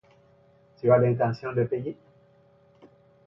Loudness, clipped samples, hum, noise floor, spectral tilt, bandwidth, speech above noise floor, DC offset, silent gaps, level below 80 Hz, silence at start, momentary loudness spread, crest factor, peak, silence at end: -25 LUFS; under 0.1%; none; -59 dBFS; -10.5 dB/octave; 6 kHz; 36 dB; under 0.1%; none; -66 dBFS; 0.85 s; 15 LU; 20 dB; -8 dBFS; 1.35 s